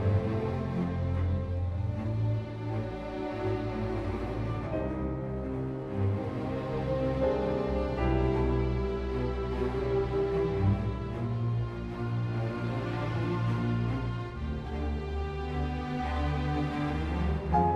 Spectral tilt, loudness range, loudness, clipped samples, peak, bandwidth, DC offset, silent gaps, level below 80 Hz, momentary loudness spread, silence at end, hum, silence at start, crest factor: -9 dB/octave; 3 LU; -32 LUFS; under 0.1%; -12 dBFS; 8 kHz; under 0.1%; none; -38 dBFS; 6 LU; 0 s; none; 0 s; 18 dB